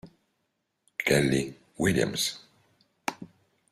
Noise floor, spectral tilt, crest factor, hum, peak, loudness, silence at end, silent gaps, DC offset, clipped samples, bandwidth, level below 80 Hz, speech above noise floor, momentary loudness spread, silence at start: -78 dBFS; -4 dB/octave; 22 dB; none; -8 dBFS; -28 LUFS; 0.45 s; none; under 0.1%; under 0.1%; 15.5 kHz; -58 dBFS; 53 dB; 15 LU; 0.05 s